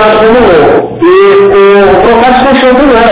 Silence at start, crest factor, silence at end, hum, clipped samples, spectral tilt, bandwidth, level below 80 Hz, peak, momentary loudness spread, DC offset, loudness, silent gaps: 0 s; 4 dB; 0 s; none; 20%; -9.5 dB/octave; 4 kHz; -28 dBFS; 0 dBFS; 2 LU; under 0.1%; -3 LUFS; none